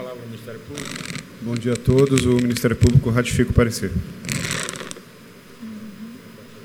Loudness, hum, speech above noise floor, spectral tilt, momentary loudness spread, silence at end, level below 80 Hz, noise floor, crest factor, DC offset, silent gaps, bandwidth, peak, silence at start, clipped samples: -20 LUFS; none; 24 dB; -5.5 dB/octave; 21 LU; 0 s; -36 dBFS; -44 dBFS; 22 dB; under 0.1%; none; 17 kHz; 0 dBFS; 0 s; under 0.1%